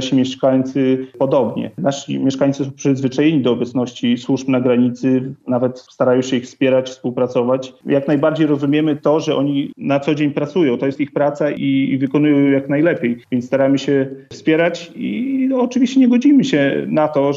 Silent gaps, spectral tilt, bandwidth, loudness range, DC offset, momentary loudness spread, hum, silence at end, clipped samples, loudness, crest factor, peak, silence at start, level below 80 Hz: none; -6.5 dB/octave; 7.6 kHz; 2 LU; under 0.1%; 6 LU; none; 0 s; under 0.1%; -17 LUFS; 12 dB; -4 dBFS; 0 s; -66 dBFS